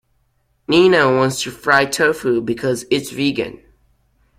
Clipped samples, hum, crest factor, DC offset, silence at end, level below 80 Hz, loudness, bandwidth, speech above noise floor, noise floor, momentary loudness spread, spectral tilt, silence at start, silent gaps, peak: under 0.1%; none; 18 dB; under 0.1%; 0.85 s; -52 dBFS; -16 LUFS; 16 kHz; 47 dB; -63 dBFS; 9 LU; -4.5 dB/octave; 0.7 s; none; 0 dBFS